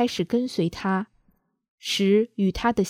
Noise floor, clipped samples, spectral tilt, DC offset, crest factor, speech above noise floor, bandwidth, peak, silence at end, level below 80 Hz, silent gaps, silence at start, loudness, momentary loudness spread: -66 dBFS; under 0.1%; -5.5 dB/octave; under 0.1%; 16 dB; 43 dB; 15.5 kHz; -10 dBFS; 0 s; -50 dBFS; 1.68-1.78 s; 0 s; -24 LUFS; 8 LU